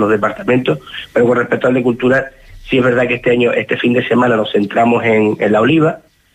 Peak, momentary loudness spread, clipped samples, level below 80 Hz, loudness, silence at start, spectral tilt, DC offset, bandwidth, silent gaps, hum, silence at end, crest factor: -2 dBFS; 5 LU; under 0.1%; -46 dBFS; -13 LUFS; 0 s; -7 dB/octave; under 0.1%; 9.2 kHz; none; none; 0.35 s; 12 dB